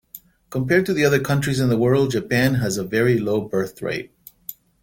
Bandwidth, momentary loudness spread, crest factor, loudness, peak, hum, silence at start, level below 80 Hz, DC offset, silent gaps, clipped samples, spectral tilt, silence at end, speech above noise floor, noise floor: 17 kHz; 17 LU; 18 dB; -20 LUFS; -4 dBFS; none; 0.15 s; -50 dBFS; under 0.1%; none; under 0.1%; -6 dB/octave; 0.3 s; 26 dB; -46 dBFS